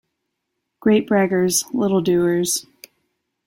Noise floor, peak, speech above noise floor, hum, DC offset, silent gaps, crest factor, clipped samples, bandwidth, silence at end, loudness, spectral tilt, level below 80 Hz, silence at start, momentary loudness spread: -77 dBFS; -6 dBFS; 60 dB; none; under 0.1%; none; 16 dB; under 0.1%; 16.5 kHz; 0.85 s; -19 LUFS; -4.5 dB/octave; -60 dBFS; 0.85 s; 5 LU